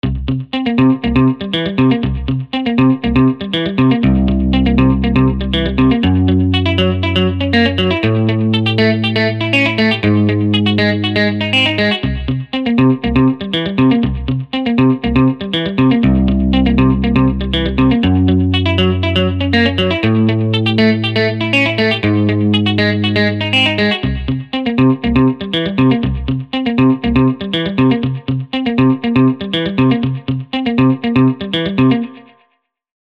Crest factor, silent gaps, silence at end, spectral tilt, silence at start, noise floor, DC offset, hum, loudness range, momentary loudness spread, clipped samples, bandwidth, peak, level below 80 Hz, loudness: 12 dB; none; 0.9 s; -7.5 dB/octave; 0.05 s; -63 dBFS; under 0.1%; none; 2 LU; 6 LU; under 0.1%; 8.4 kHz; 0 dBFS; -28 dBFS; -14 LUFS